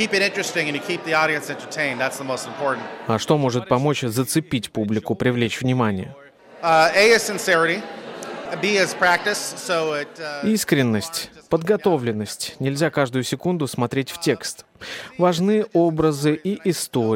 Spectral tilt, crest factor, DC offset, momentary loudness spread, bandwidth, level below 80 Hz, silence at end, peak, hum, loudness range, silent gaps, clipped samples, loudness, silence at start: -4.5 dB/octave; 18 dB; under 0.1%; 10 LU; 17 kHz; -58 dBFS; 0 s; -2 dBFS; none; 4 LU; none; under 0.1%; -21 LUFS; 0 s